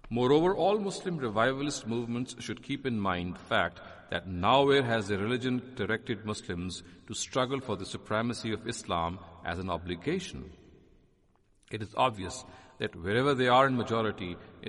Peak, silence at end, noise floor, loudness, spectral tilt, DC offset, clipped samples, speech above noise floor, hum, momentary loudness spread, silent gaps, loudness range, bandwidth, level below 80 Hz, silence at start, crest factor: -10 dBFS; 0 s; -67 dBFS; -31 LUFS; -5 dB/octave; under 0.1%; under 0.1%; 36 dB; none; 15 LU; none; 7 LU; 11.5 kHz; -58 dBFS; 0.05 s; 20 dB